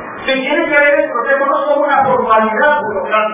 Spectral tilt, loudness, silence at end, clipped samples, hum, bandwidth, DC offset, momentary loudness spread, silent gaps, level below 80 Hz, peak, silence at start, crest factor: -7.5 dB/octave; -12 LUFS; 0 s; under 0.1%; none; 3.8 kHz; under 0.1%; 5 LU; none; -50 dBFS; 0 dBFS; 0 s; 12 dB